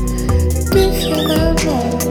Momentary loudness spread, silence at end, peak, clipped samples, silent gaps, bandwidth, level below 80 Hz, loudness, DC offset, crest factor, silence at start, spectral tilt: 3 LU; 0 s; 0 dBFS; under 0.1%; none; over 20 kHz; -22 dBFS; -15 LUFS; under 0.1%; 14 dB; 0 s; -5.5 dB/octave